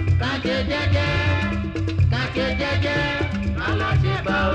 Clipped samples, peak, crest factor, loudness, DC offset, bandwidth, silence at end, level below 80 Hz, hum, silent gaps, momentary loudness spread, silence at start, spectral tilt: under 0.1%; -10 dBFS; 12 dB; -22 LUFS; under 0.1%; 8.2 kHz; 0 s; -32 dBFS; none; none; 4 LU; 0 s; -6.5 dB/octave